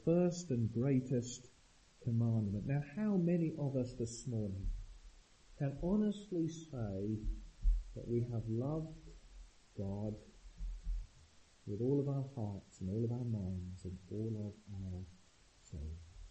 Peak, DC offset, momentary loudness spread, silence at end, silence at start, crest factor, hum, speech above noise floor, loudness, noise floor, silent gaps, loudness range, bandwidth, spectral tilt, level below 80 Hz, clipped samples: -22 dBFS; under 0.1%; 15 LU; 0 s; 0 s; 18 dB; none; 28 dB; -40 LUFS; -65 dBFS; none; 6 LU; 8.4 kHz; -8 dB/octave; -48 dBFS; under 0.1%